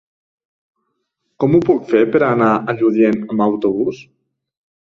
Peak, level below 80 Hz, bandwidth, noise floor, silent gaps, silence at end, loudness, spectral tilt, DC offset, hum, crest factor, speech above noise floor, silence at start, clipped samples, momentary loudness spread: -2 dBFS; -58 dBFS; 6.8 kHz; -71 dBFS; none; 0.95 s; -15 LUFS; -9 dB/octave; under 0.1%; none; 16 dB; 57 dB; 1.4 s; under 0.1%; 7 LU